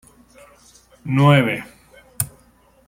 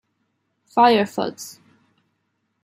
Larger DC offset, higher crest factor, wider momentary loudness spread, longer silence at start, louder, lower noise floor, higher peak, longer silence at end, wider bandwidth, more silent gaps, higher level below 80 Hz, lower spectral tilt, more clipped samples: neither; about the same, 20 dB vs 18 dB; about the same, 20 LU vs 21 LU; first, 1.05 s vs 0.75 s; about the same, -18 LUFS vs -19 LUFS; second, -54 dBFS vs -73 dBFS; about the same, -2 dBFS vs -4 dBFS; second, 0.6 s vs 1.15 s; about the same, 16.5 kHz vs 16 kHz; neither; first, -54 dBFS vs -74 dBFS; about the same, -5.5 dB/octave vs -4.5 dB/octave; neither